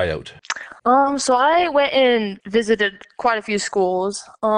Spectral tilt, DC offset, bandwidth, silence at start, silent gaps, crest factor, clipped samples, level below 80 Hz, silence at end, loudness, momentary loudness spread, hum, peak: -3.5 dB/octave; under 0.1%; 11 kHz; 0 s; none; 14 dB; under 0.1%; -50 dBFS; 0 s; -19 LUFS; 10 LU; none; -6 dBFS